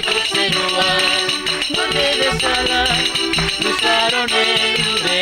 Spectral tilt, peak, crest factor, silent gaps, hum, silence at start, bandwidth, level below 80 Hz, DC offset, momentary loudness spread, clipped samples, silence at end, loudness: -2 dB/octave; -4 dBFS; 14 dB; none; none; 0 s; 16 kHz; -40 dBFS; under 0.1%; 3 LU; under 0.1%; 0 s; -15 LUFS